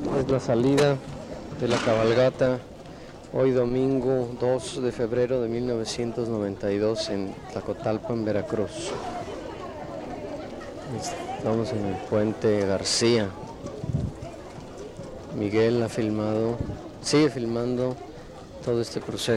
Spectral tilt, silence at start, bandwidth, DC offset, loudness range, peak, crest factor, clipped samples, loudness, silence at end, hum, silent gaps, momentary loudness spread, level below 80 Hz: -5.5 dB/octave; 0 s; 13.5 kHz; under 0.1%; 6 LU; -10 dBFS; 16 dB; under 0.1%; -26 LUFS; 0 s; none; none; 15 LU; -48 dBFS